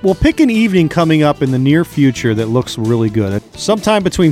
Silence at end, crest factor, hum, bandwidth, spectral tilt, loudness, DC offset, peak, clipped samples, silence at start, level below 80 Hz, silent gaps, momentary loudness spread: 0 s; 12 dB; none; 15 kHz; -6.5 dB/octave; -13 LUFS; under 0.1%; -2 dBFS; under 0.1%; 0.05 s; -32 dBFS; none; 5 LU